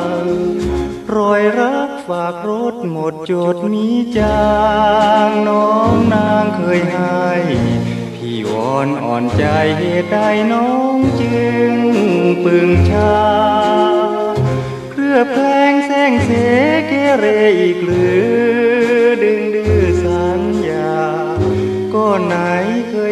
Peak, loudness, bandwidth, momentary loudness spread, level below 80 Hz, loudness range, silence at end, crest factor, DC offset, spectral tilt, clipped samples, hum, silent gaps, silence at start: 0 dBFS; -14 LUFS; 12.5 kHz; 7 LU; -36 dBFS; 4 LU; 0 s; 12 dB; under 0.1%; -7 dB/octave; under 0.1%; none; none; 0 s